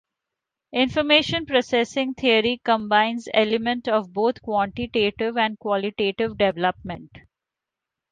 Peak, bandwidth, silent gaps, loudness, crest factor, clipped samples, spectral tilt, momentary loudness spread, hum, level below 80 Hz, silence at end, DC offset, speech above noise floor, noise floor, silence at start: -4 dBFS; 9.4 kHz; none; -22 LUFS; 20 dB; under 0.1%; -4.5 dB/octave; 7 LU; none; -54 dBFS; 0.9 s; under 0.1%; 64 dB; -87 dBFS; 0.75 s